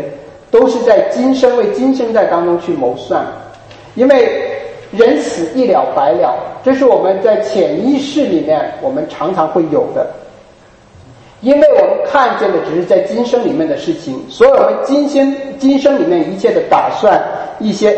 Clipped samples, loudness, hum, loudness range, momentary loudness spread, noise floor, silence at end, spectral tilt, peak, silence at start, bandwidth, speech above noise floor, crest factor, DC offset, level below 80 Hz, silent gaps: under 0.1%; -12 LUFS; none; 3 LU; 9 LU; -42 dBFS; 0 s; -6 dB/octave; 0 dBFS; 0 s; 8.6 kHz; 31 dB; 12 dB; under 0.1%; -50 dBFS; none